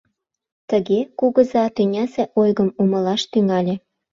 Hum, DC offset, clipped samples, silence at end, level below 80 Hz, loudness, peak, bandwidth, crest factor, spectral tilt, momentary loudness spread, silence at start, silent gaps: none; under 0.1%; under 0.1%; 0.35 s; -62 dBFS; -19 LUFS; -2 dBFS; 7.6 kHz; 16 dB; -7 dB/octave; 5 LU; 0.7 s; none